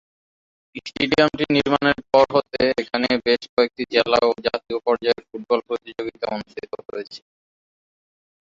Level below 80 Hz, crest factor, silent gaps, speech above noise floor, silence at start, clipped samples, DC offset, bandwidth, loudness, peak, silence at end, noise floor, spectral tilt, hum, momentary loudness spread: -54 dBFS; 20 dB; 3.49-3.57 s; over 69 dB; 0.75 s; under 0.1%; under 0.1%; 7.6 kHz; -21 LUFS; -2 dBFS; 1.3 s; under -90 dBFS; -5.5 dB/octave; none; 16 LU